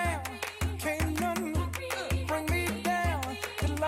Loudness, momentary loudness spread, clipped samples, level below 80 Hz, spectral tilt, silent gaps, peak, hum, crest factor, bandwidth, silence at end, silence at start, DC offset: -32 LUFS; 5 LU; under 0.1%; -40 dBFS; -5 dB/octave; none; -18 dBFS; none; 12 dB; 16.5 kHz; 0 s; 0 s; under 0.1%